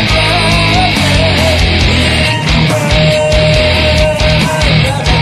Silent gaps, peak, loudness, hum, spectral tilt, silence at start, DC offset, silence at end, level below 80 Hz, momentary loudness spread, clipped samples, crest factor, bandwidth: none; 0 dBFS; -9 LUFS; none; -5 dB/octave; 0 s; under 0.1%; 0 s; -18 dBFS; 2 LU; under 0.1%; 10 dB; 14.5 kHz